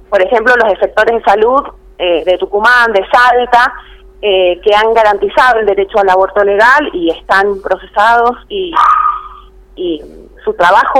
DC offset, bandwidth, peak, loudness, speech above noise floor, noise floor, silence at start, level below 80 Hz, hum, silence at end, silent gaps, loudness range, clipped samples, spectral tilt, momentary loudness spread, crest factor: under 0.1%; 15.5 kHz; 0 dBFS; -10 LUFS; 25 dB; -34 dBFS; 0.1 s; -38 dBFS; none; 0 s; none; 3 LU; 0.3%; -4 dB/octave; 11 LU; 10 dB